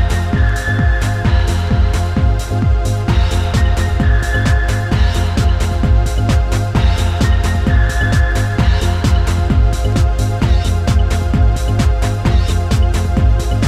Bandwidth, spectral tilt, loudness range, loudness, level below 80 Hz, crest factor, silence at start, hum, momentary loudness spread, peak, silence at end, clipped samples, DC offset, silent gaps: 13.5 kHz; -6 dB/octave; 1 LU; -15 LUFS; -16 dBFS; 12 dB; 0 s; none; 1 LU; -2 dBFS; 0 s; under 0.1%; under 0.1%; none